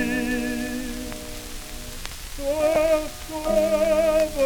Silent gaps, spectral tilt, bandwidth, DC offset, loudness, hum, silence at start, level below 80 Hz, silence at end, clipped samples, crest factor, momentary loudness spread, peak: none; -4 dB/octave; over 20 kHz; under 0.1%; -23 LUFS; none; 0 s; -38 dBFS; 0 s; under 0.1%; 18 dB; 15 LU; -6 dBFS